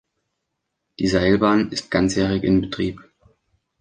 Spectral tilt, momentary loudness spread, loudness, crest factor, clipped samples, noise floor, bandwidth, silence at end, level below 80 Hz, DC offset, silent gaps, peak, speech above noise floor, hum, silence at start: -6 dB/octave; 9 LU; -20 LUFS; 18 dB; under 0.1%; -78 dBFS; 9.8 kHz; 0.8 s; -42 dBFS; under 0.1%; none; -4 dBFS; 59 dB; none; 1 s